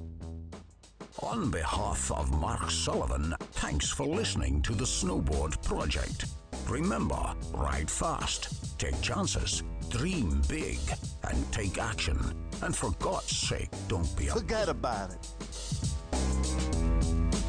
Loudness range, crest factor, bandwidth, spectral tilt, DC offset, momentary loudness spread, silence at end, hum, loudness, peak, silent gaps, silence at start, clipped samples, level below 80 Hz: 2 LU; 12 dB; 10.5 kHz; -4.5 dB/octave; under 0.1%; 7 LU; 0 s; none; -32 LUFS; -20 dBFS; none; 0 s; under 0.1%; -36 dBFS